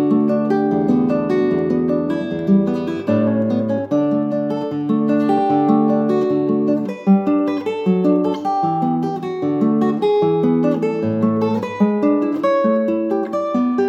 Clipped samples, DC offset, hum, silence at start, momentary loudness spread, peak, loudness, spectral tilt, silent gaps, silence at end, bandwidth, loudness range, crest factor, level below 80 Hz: under 0.1%; under 0.1%; none; 0 s; 5 LU; -2 dBFS; -18 LUFS; -9 dB/octave; none; 0 s; 7.4 kHz; 1 LU; 14 dB; -60 dBFS